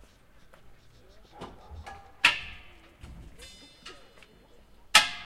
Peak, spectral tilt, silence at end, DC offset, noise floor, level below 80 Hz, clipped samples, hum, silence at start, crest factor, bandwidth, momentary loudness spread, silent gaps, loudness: -2 dBFS; 0 dB/octave; 0 s; under 0.1%; -56 dBFS; -56 dBFS; under 0.1%; none; 1.4 s; 32 dB; 16 kHz; 28 LU; none; -23 LUFS